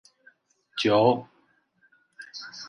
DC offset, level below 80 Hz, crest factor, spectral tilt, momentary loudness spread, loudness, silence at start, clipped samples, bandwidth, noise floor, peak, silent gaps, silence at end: under 0.1%; -70 dBFS; 22 dB; -5.5 dB/octave; 21 LU; -24 LUFS; 0.75 s; under 0.1%; 10.5 kHz; -66 dBFS; -6 dBFS; none; 0 s